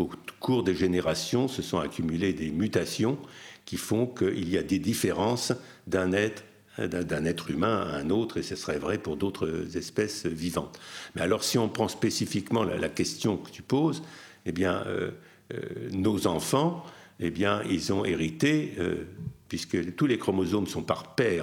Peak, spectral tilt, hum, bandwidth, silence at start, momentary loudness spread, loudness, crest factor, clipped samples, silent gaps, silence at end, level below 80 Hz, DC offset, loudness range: -10 dBFS; -5 dB/octave; none; 18 kHz; 0 s; 10 LU; -29 LUFS; 20 dB; under 0.1%; none; 0 s; -56 dBFS; under 0.1%; 2 LU